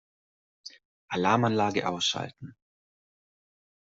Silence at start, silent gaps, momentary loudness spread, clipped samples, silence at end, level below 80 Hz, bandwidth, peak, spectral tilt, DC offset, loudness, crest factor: 0.65 s; 0.85-1.08 s; 23 LU; under 0.1%; 1.4 s; -70 dBFS; 8 kHz; -8 dBFS; -4.5 dB/octave; under 0.1%; -27 LUFS; 24 dB